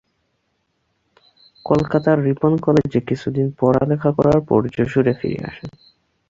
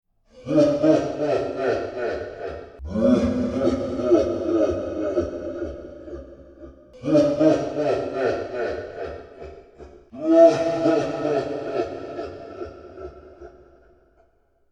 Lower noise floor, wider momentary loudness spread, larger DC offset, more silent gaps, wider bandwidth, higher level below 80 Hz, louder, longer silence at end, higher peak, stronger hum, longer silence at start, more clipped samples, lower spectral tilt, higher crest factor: first, -69 dBFS vs -62 dBFS; second, 12 LU vs 20 LU; neither; neither; second, 7.6 kHz vs 9 kHz; about the same, -46 dBFS vs -46 dBFS; first, -18 LUFS vs -22 LUFS; second, 0.6 s vs 1.2 s; about the same, -2 dBFS vs -2 dBFS; neither; first, 1.65 s vs 0.35 s; neither; first, -9 dB/octave vs -7 dB/octave; about the same, 16 dB vs 20 dB